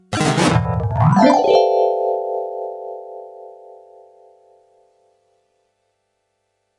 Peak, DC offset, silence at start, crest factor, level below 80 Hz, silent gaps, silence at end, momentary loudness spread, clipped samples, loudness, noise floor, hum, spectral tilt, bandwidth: 0 dBFS; under 0.1%; 0.1 s; 20 dB; -46 dBFS; none; 3.25 s; 22 LU; under 0.1%; -16 LUFS; -71 dBFS; 50 Hz at -60 dBFS; -6 dB/octave; 11.5 kHz